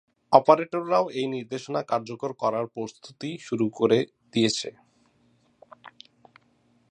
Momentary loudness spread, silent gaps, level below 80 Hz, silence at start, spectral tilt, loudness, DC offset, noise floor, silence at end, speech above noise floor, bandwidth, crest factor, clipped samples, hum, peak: 15 LU; none; -72 dBFS; 0.3 s; -5 dB/octave; -25 LUFS; under 0.1%; -65 dBFS; 1 s; 40 dB; 10 kHz; 26 dB; under 0.1%; none; 0 dBFS